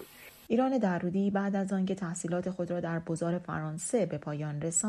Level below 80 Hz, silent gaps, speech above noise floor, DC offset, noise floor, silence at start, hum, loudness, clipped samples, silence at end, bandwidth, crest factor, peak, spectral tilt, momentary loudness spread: -66 dBFS; none; 20 dB; under 0.1%; -51 dBFS; 0 s; none; -32 LUFS; under 0.1%; 0 s; 13.5 kHz; 16 dB; -16 dBFS; -5.5 dB/octave; 7 LU